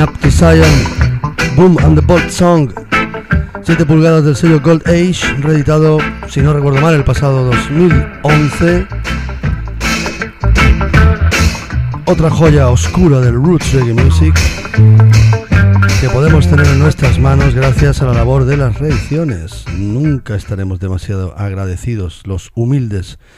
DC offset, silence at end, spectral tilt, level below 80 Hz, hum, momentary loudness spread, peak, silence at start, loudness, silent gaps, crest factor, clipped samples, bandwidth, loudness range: under 0.1%; 0.2 s; -6.5 dB/octave; -20 dBFS; none; 11 LU; 0 dBFS; 0 s; -11 LUFS; none; 10 dB; under 0.1%; 15 kHz; 6 LU